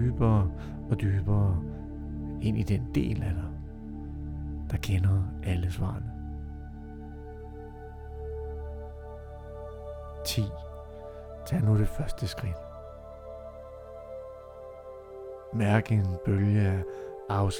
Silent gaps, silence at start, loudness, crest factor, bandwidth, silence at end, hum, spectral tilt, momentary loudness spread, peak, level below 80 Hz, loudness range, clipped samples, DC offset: none; 0 s; -30 LUFS; 22 dB; 16.5 kHz; 0 s; none; -7 dB/octave; 18 LU; -8 dBFS; -42 dBFS; 11 LU; under 0.1%; under 0.1%